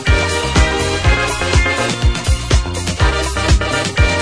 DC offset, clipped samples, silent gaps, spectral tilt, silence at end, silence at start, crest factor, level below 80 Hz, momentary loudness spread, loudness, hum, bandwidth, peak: under 0.1%; under 0.1%; none; -4 dB/octave; 0 s; 0 s; 14 dB; -18 dBFS; 3 LU; -15 LUFS; none; 11 kHz; -2 dBFS